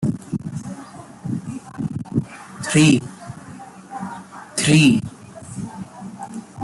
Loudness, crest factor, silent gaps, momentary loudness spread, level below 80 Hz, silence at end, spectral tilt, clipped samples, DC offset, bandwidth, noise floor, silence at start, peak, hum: -20 LUFS; 20 dB; none; 22 LU; -54 dBFS; 0 s; -5 dB/octave; under 0.1%; under 0.1%; 12 kHz; -39 dBFS; 0 s; -2 dBFS; none